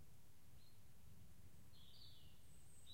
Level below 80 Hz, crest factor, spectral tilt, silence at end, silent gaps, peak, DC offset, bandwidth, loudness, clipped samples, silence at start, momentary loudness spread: -74 dBFS; 16 dB; -3.5 dB/octave; 0 s; none; -48 dBFS; 0.2%; 16 kHz; -67 LUFS; under 0.1%; 0 s; 6 LU